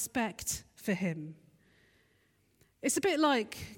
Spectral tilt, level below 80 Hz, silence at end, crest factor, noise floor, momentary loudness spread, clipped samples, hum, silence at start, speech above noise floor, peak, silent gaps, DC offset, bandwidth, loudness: -3.5 dB/octave; -64 dBFS; 0 s; 18 dB; -71 dBFS; 10 LU; under 0.1%; none; 0 s; 38 dB; -16 dBFS; none; under 0.1%; 17.5 kHz; -32 LUFS